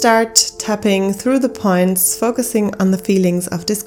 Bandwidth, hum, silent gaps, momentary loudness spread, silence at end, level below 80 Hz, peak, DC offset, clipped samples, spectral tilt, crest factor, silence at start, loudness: 19 kHz; none; none; 5 LU; 0 s; -50 dBFS; 0 dBFS; under 0.1%; under 0.1%; -4 dB/octave; 16 dB; 0 s; -15 LUFS